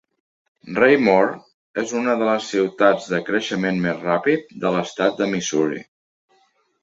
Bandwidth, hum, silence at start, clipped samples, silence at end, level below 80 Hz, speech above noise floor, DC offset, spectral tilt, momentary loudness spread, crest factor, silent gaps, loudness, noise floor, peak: 8 kHz; none; 0.65 s; under 0.1%; 1 s; -62 dBFS; 43 dB; under 0.1%; -5 dB/octave; 9 LU; 20 dB; 1.54-1.74 s; -20 LUFS; -62 dBFS; -2 dBFS